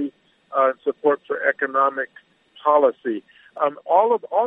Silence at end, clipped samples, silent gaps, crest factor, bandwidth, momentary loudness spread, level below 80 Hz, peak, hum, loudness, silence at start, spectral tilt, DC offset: 0 s; under 0.1%; none; 18 dB; 3.9 kHz; 11 LU; -82 dBFS; -4 dBFS; none; -21 LUFS; 0 s; -7.5 dB/octave; under 0.1%